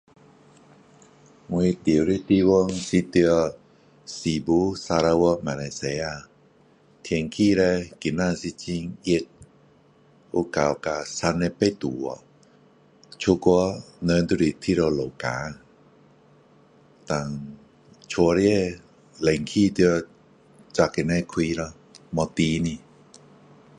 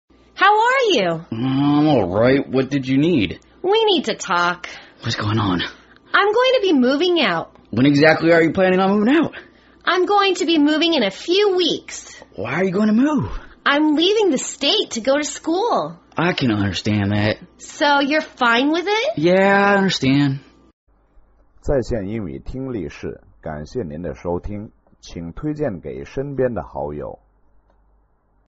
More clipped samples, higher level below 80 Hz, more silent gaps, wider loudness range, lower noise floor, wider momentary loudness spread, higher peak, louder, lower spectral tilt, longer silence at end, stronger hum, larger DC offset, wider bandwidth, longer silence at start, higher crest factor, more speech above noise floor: neither; about the same, -48 dBFS vs -44 dBFS; second, none vs 20.73-20.87 s; second, 5 LU vs 11 LU; about the same, -57 dBFS vs -60 dBFS; second, 12 LU vs 15 LU; second, -4 dBFS vs 0 dBFS; second, -24 LUFS vs -18 LUFS; first, -6 dB/octave vs -3.5 dB/octave; second, 1 s vs 1.35 s; neither; neither; first, 10.5 kHz vs 8 kHz; first, 1.5 s vs 0.35 s; about the same, 20 dB vs 18 dB; second, 34 dB vs 42 dB